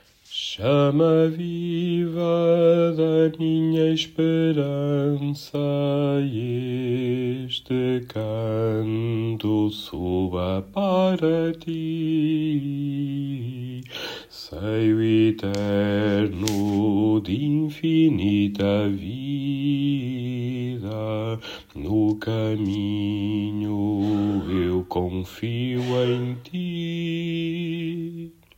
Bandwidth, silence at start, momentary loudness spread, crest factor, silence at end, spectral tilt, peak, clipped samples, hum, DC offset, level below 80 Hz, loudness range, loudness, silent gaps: 16 kHz; 0.3 s; 10 LU; 20 dB; 0.25 s; -7.5 dB/octave; -2 dBFS; under 0.1%; none; under 0.1%; -56 dBFS; 5 LU; -24 LUFS; none